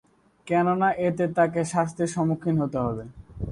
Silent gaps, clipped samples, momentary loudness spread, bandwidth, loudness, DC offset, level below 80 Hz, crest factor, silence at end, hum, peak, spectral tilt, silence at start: none; under 0.1%; 8 LU; 11.5 kHz; -25 LUFS; under 0.1%; -50 dBFS; 16 dB; 0 s; none; -10 dBFS; -7 dB/octave; 0.45 s